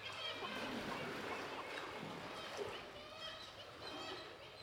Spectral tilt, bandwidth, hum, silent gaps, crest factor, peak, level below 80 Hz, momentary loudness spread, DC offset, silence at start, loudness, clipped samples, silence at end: -3.5 dB/octave; 19.5 kHz; none; none; 16 dB; -32 dBFS; -72 dBFS; 7 LU; under 0.1%; 0 s; -47 LUFS; under 0.1%; 0 s